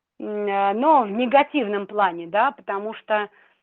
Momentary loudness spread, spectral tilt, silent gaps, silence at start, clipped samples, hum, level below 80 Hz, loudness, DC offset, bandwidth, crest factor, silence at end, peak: 11 LU; -8 dB/octave; none; 0.2 s; under 0.1%; none; -72 dBFS; -22 LUFS; under 0.1%; 4.3 kHz; 18 dB; 0.35 s; -4 dBFS